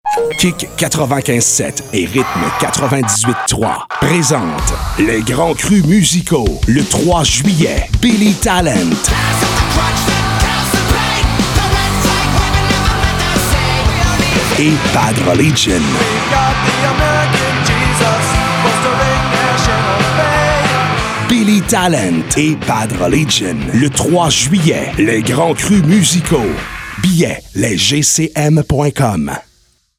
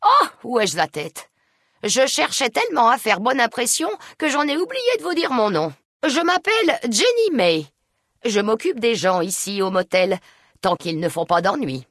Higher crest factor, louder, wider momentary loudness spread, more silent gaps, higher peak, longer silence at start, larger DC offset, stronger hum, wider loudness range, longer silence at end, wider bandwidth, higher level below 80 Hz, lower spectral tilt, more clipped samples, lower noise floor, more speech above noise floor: about the same, 12 dB vs 16 dB; first, -12 LUFS vs -20 LUFS; second, 4 LU vs 8 LU; second, none vs 5.85-6.00 s; first, 0 dBFS vs -4 dBFS; about the same, 0.05 s vs 0 s; neither; neither; about the same, 2 LU vs 2 LU; first, 0.55 s vs 0.1 s; first, 18.5 kHz vs 12 kHz; first, -24 dBFS vs -66 dBFS; about the same, -4 dB/octave vs -3 dB/octave; neither; second, -54 dBFS vs -69 dBFS; second, 41 dB vs 50 dB